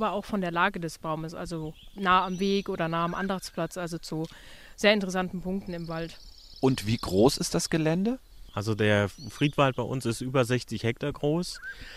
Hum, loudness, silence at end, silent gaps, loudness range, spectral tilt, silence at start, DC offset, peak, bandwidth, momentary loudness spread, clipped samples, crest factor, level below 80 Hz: none; -28 LUFS; 0 s; none; 3 LU; -5 dB/octave; 0 s; under 0.1%; -8 dBFS; 15.5 kHz; 13 LU; under 0.1%; 20 dB; -50 dBFS